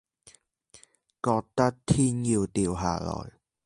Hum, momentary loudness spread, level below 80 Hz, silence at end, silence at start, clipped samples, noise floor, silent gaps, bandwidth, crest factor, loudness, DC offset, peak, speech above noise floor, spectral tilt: none; 10 LU; -48 dBFS; 0.35 s; 1.25 s; under 0.1%; -59 dBFS; none; 11.5 kHz; 20 dB; -27 LUFS; under 0.1%; -8 dBFS; 32 dB; -6 dB/octave